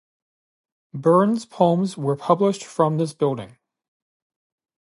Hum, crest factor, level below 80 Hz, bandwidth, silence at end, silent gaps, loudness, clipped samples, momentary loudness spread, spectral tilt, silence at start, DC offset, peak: none; 20 dB; -70 dBFS; 11.5 kHz; 1.35 s; none; -21 LUFS; under 0.1%; 7 LU; -7.5 dB/octave; 0.95 s; under 0.1%; -2 dBFS